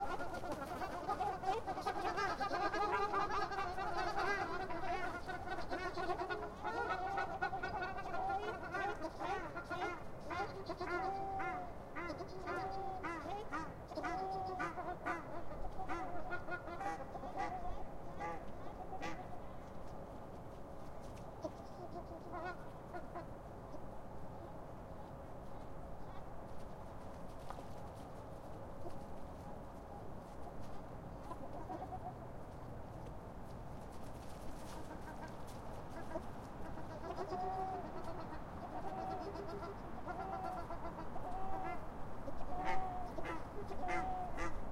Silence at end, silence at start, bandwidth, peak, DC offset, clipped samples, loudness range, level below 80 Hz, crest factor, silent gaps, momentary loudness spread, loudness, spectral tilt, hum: 0 s; 0 s; 15.5 kHz; -24 dBFS; under 0.1%; under 0.1%; 12 LU; -56 dBFS; 18 dB; none; 12 LU; -45 LUFS; -5.5 dB/octave; none